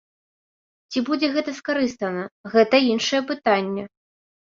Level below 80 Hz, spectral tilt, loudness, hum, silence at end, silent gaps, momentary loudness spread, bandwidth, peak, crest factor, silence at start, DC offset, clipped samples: -66 dBFS; -4 dB/octave; -22 LUFS; none; 0.7 s; 2.32-2.44 s; 12 LU; 7.6 kHz; -4 dBFS; 20 dB; 0.9 s; under 0.1%; under 0.1%